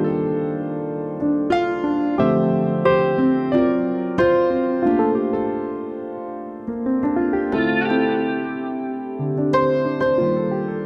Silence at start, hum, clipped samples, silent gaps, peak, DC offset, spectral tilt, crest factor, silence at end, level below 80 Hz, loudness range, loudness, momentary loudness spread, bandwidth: 0 s; none; under 0.1%; none; -4 dBFS; under 0.1%; -8.5 dB/octave; 16 dB; 0 s; -50 dBFS; 4 LU; -20 LUFS; 9 LU; 7 kHz